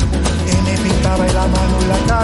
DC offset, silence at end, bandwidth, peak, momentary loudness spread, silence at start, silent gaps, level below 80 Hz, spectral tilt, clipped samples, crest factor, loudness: under 0.1%; 0 s; 11.5 kHz; -2 dBFS; 1 LU; 0 s; none; -20 dBFS; -5.5 dB/octave; under 0.1%; 12 dB; -15 LUFS